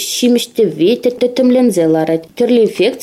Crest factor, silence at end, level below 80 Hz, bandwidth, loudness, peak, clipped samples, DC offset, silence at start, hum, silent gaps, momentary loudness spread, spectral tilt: 10 dB; 0 s; -58 dBFS; 15.5 kHz; -13 LUFS; -2 dBFS; under 0.1%; under 0.1%; 0 s; none; none; 4 LU; -4.5 dB/octave